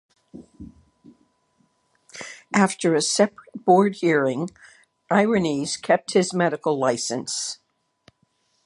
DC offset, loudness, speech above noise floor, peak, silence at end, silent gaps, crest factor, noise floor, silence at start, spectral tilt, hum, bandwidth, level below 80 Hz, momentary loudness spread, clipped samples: under 0.1%; -22 LUFS; 47 dB; -2 dBFS; 1.1 s; none; 22 dB; -68 dBFS; 0.35 s; -4.5 dB/octave; none; 11.5 kHz; -62 dBFS; 17 LU; under 0.1%